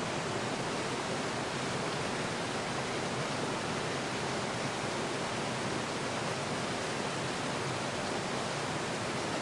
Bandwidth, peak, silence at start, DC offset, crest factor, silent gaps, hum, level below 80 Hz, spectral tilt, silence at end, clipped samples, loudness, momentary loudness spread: 11.5 kHz; -20 dBFS; 0 s; under 0.1%; 14 dB; none; none; -62 dBFS; -3.5 dB/octave; 0 s; under 0.1%; -34 LUFS; 0 LU